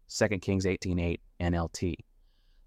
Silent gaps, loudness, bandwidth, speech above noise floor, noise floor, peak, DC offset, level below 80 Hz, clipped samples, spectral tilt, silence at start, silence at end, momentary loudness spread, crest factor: none; -31 LUFS; 14 kHz; 32 dB; -62 dBFS; -12 dBFS; under 0.1%; -46 dBFS; under 0.1%; -5.5 dB/octave; 0.1 s; 0.7 s; 6 LU; 20 dB